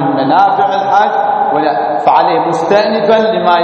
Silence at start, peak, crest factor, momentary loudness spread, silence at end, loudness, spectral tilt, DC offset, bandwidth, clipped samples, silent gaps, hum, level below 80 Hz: 0 s; 0 dBFS; 10 dB; 3 LU; 0 s; -11 LUFS; -6 dB/octave; under 0.1%; 8.8 kHz; under 0.1%; none; none; -54 dBFS